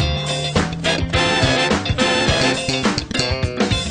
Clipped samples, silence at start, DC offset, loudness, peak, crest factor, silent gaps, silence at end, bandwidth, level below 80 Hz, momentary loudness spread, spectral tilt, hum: under 0.1%; 0 s; under 0.1%; -18 LUFS; -4 dBFS; 14 dB; none; 0 s; 11.5 kHz; -32 dBFS; 5 LU; -4 dB/octave; none